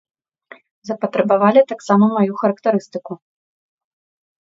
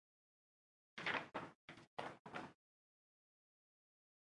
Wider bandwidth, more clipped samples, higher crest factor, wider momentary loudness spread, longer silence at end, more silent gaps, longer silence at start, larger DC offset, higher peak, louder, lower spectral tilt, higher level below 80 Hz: second, 7.8 kHz vs 11 kHz; neither; second, 18 dB vs 26 dB; first, 19 LU vs 16 LU; second, 1.25 s vs 1.8 s; second, none vs 1.55-1.68 s, 1.87-1.97 s, 2.19-2.25 s; about the same, 0.85 s vs 0.95 s; neither; first, 0 dBFS vs -28 dBFS; first, -16 LUFS vs -48 LUFS; first, -7.5 dB/octave vs -4 dB/octave; first, -68 dBFS vs under -90 dBFS